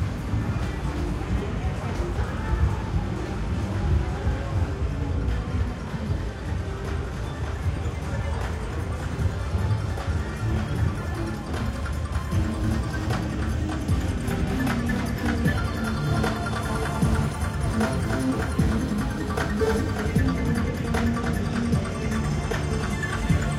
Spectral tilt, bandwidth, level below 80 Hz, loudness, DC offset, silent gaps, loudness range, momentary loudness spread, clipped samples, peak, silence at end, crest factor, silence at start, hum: -6.5 dB/octave; 15 kHz; -30 dBFS; -27 LUFS; under 0.1%; none; 4 LU; 6 LU; under 0.1%; -10 dBFS; 0 s; 16 dB; 0 s; none